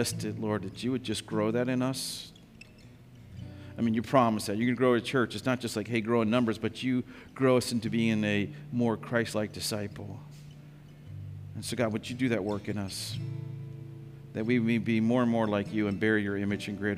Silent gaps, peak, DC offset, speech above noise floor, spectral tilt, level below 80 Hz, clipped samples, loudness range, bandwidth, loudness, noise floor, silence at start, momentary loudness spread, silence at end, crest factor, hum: none; -10 dBFS; under 0.1%; 23 dB; -5.5 dB/octave; -62 dBFS; under 0.1%; 6 LU; 15.5 kHz; -30 LUFS; -52 dBFS; 0 s; 18 LU; 0 s; 20 dB; none